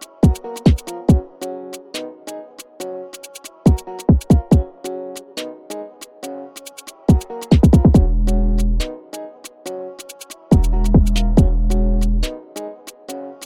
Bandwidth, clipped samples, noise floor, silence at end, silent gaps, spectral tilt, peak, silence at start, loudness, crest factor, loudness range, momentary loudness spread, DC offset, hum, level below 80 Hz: 15 kHz; under 0.1%; -38 dBFS; 0 s; none; -7.5 dB/octave; 0 dBFS; 0 s; -17 LUFS; 16 dB; 5 LU; 19 LU; under 0.1%; none; -20 dBFS